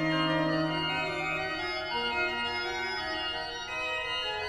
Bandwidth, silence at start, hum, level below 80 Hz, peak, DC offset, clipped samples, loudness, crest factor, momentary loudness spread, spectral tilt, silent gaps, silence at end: 13.5 kHz; 0 s; none; -56 dBFS; -16 dBFS; under 0.1%; under 0.1%; -30 LUFS; 14 dB; 5 LU; -4.5 dB/octave; none; 0 s